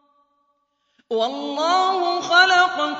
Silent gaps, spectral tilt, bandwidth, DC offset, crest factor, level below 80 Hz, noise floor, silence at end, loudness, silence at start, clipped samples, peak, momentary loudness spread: none; -1 dB/octave; 8 kHz; under 0.1%; 18 dB; -80 dBFS; -69 dBFS; 0 s; -18 LUFS; 1.1 s; under 0.1%; -2 dBFS; 10 LU